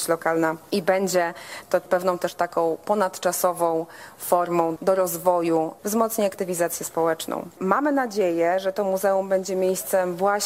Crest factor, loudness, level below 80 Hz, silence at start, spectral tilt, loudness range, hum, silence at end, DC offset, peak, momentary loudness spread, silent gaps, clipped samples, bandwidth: 18 dB; -23 LUFS; -68 dBFS; 0 s; -4 dB/octave; 1 LU; none; 0 s; under 0.1%; -4 dBFS; 4 LU; none; under 0.1%; 16 kHz